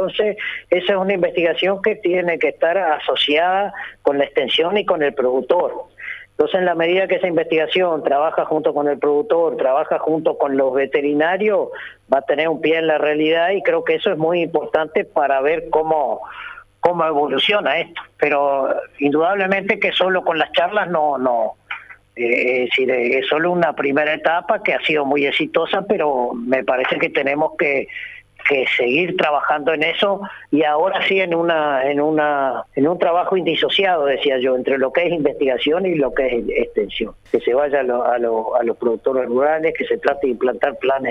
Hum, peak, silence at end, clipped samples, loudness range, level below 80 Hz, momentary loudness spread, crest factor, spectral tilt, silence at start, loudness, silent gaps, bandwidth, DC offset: none; -4 dBFS; 0 s; under 0.1%; 2 LU; -54 dBFS; 5 LU; 14 dB; -6.5 dB/octave; 0 s; -18 LUFS; none; 6.8 kHz; under 0.1%